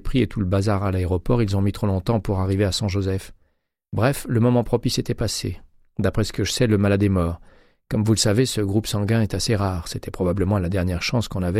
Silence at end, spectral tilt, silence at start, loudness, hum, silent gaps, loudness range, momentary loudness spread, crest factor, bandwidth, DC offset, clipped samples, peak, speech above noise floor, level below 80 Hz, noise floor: 0 s; -6 dB/octave; 0.05 s; -22 LUFS; none; none; 2 LU; 8 LU; 16 dB; 15.5 kHz; under 0.1%; under 0.1%; -6 dBFS; 46 dB; -38 dBFS; -67 dBFS